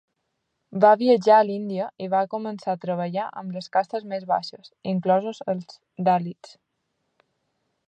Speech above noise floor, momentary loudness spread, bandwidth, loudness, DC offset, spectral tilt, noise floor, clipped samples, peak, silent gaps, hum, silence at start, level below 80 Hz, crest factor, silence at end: 54 dB; 15 LU; 8.8 kHz; -23 LUFS; under 0.1%; -7 dB/octave; -77 dBFS; under 0.1%; -4 dBFS; none; none; 0.7 s; -78 dBFS; 20 dB; 1.55 s